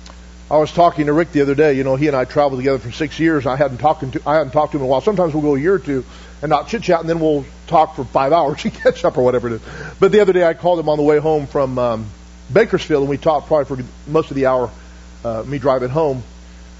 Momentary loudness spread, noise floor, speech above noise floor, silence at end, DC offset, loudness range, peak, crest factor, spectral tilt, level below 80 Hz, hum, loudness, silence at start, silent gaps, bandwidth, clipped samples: 10 LU; -37 dBFS; 21 dB; 0 s; under 0.1%; 3 LU; -2 dBFS; 16 dB; -7 dB/octave; -40 dBFS; none; -17 LUFS; 0 s; none; 8 kHz; under 0.1%